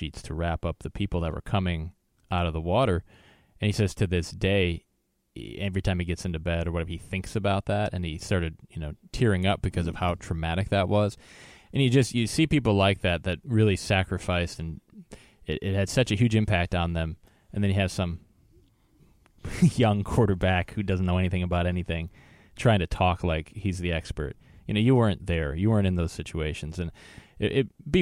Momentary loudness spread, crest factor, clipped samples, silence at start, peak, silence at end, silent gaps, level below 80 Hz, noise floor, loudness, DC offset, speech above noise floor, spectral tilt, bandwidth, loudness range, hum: 12 LU; 18 dB; under 0.1%; 0 s; -8 dBFS; 0 s; none; -42 dBFS; -60 dBFS; -27 LUFS; under 0.1%; 34 dB; -6.5 dB/octave; 13 kHz; 4 LU; none